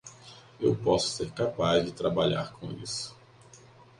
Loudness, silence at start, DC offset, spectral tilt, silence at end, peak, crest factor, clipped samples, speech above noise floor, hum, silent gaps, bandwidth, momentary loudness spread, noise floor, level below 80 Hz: -29 LUFS; 0.05 s; under 0.1%; -5 dB/octave; 0.45 s; -12 dBFS; 18 dB; under 0.1%; 26 dB; none; none; 11.5 kHz; 15 LU; -54 dBFS; -56 dBFS